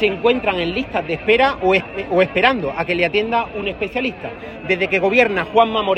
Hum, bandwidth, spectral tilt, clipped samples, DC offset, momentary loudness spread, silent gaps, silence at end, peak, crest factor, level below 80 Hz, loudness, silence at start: none; 8.8 kHz; -6 dB/octave; under 0.1%; under 0.1%; 8 LU; none; 0 s; 0 dBFS; 18 dB; -44 dBFS; -17 LUFS; 0 s